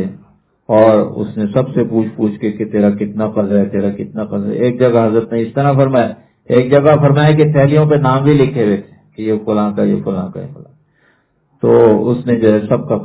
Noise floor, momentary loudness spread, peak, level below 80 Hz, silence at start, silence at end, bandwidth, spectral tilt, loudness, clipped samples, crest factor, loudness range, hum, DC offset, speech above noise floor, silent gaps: -57 dBFS; 10 LU; 0 dBFS; -46 dBFS; 0 s; 0 s; 4 kHz; -12.5 dB/octave; -13 LUFS; 0.1%; 12 dB; 5 LU; none; under 0.1%; 45 dB; none